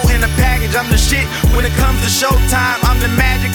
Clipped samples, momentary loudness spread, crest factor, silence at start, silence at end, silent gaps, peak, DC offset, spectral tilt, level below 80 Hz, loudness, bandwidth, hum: under 0.1%; 2 LU; 12 dB; 0 s; 0 s; none; 0 dBFS; under 0.1%; -4 dB/octave; -16 dBFS; -13 LUFS; 19.5 kHz; none